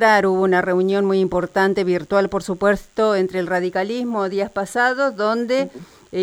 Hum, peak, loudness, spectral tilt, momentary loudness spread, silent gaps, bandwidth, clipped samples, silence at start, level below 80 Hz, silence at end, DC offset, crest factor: none; -4 dBFS; -19 LUFS; -6 dB/octave; 5 LU; none; 13.5 kHz; under 0.1%; 0 s; -50 dBFS; 0 s; under 0.1%; 14 dB